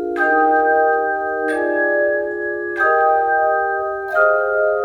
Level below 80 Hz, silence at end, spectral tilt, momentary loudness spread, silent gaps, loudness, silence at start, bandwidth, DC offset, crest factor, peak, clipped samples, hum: -56 dBFS; 0 s; -5.5 dB/octave; 6 LU; none; -17 LUFS; 0 s; 9.6 kHz; under 0.1%; 14 dB; -2 dBFS; under 0.1%; none